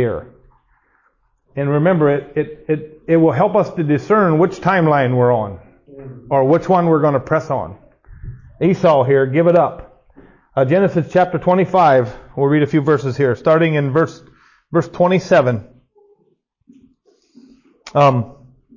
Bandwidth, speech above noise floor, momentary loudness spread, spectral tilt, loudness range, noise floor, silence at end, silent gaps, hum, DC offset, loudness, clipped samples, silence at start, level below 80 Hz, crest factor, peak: 7.4 kHz; 47 dB; 10 LU; -8.5 dB/octave; 5 LU; -62 dBFS; 0.45 s; none; none; under 0.1%; -15 LUFS; under 0.1%; 0 s; -48 dBFS; 14 dB; -2 dBFS